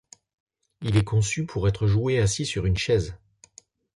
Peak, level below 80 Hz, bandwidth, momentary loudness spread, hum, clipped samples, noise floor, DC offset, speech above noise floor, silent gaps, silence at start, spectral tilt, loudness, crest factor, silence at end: -10 dBFS; -40 dBFS; 11.5 kHz; 4 LU; none; under 0.1%; -55 dBFS; under 0.1%; 32 dB; none; 0.8 s; -5.5 dB/octave; -24 LUFS; 16 dB; 0.85 s